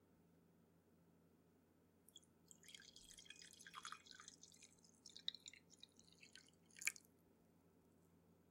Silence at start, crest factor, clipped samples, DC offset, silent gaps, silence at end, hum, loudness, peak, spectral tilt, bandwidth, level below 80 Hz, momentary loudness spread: 0 s; 42 dB; under 0.1%; under 0.1%; none; 0 s; none; -55 LUFS; -20 dBFS; 0 dB/octave; 16 kHz; under -90 dBFS; 20 LU